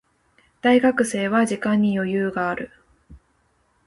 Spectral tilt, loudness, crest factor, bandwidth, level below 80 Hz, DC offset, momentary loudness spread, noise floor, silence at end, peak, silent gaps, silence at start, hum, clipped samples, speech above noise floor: -5.5 dB/octave; -21 LUFS; 16 dB; 11.5 kHz; -56 dBFS; under 0.1%; 9 LU; -65 dBFS; 0.7 s; -6 dBFS; none; 0.65 s; none; under 0.1%; 45 dB